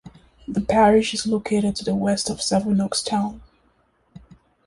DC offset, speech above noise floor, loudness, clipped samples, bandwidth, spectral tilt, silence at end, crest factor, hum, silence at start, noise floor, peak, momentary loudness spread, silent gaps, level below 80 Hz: under 0.1%; 42 dB; -21 LUFS; under 0.1%; 11.5 kHz; -4.5 dB/octave; 0.5 s; 18 dB; none; 0.05 s; -63 dBFS; -4 dBFS; 11 LU; none; -48 dBFS